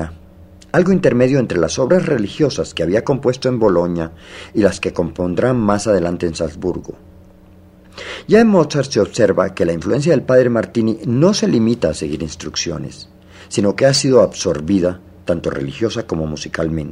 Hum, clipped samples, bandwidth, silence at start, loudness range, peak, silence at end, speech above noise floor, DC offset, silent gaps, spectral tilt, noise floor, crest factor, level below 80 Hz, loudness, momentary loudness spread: none; under 0.1%; 11.5 kHz; 0 s; 4 LU; 0 dBFS; 0 s; 28 dB; under 0.1%; none; -5.5 dB/octave; -44 dBFS; 16 dB; -44 dBFS; -16 LUFS; 11 LU